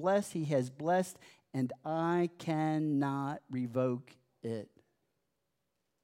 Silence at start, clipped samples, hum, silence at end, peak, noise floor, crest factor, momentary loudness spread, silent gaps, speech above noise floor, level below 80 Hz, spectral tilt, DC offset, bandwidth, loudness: 0 s; under 0.1%; none; 1.4 s; -18 dBFS; -84 dBFS; 16 dB; 10 LU; none; 50 dB; -86 dBFS; -7 dB/octave; under 0.1%; 16 kHz; -35 LUFS